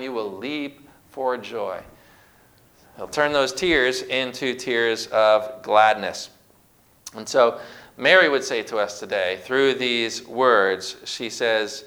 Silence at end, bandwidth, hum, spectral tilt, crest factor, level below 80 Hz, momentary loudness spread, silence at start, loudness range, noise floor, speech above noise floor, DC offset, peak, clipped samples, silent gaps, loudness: 0 s; over 20 kHz; none; -2.5 dB/octave; 22 dB; -58 dBFS; 17 LU; 0 s; 5 LU; -57 dBFS; 36 dB; under 0.1%; 0 dBFS; under 0.1%; none; -21 LUFS